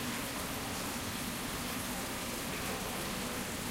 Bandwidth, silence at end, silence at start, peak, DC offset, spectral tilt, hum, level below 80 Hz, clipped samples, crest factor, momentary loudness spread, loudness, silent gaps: 16 kHz; 0 s; 0 s; -26 dBFS; under 0.1%; -3 dB/octave; none; -52 dBFS; under 0.1%; 12 dB; 1 LU; -37 LUFS; none